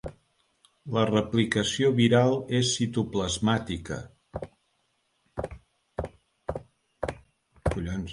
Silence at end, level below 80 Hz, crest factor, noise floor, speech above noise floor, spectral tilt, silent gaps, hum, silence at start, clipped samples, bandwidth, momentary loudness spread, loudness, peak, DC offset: 0 s; -46 dBFS; 20 dB; -73 dBFS; 48 dB; -5 dB/octave; none; none; 0.05 s; under 0.1%; 11.5 kHz; 18 LU; -27 LUFS; -8 dBFS; under 0.1%